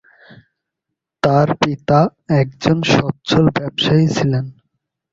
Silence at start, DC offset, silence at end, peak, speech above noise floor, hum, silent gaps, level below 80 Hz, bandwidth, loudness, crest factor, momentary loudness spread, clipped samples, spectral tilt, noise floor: 1.25 s; under 0.1%; 0.6 s; 0 dBFS; 65 dB; none; none; -48 dBFS; 7.6 kHz; -16 LUFS; 18 dB; 5 LU; under 0.1%; -6.5 dB/octave; -80 dBFS